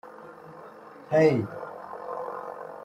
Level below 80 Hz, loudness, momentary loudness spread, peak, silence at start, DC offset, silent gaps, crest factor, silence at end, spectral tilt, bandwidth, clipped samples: -70 dBFS; -27 LUFS; 24 LU; -8 dBFS; 0.05 s; under 0.1%; none; 22 dB; 0 s; -8 dB/octave; 9 kHz; under 0.1%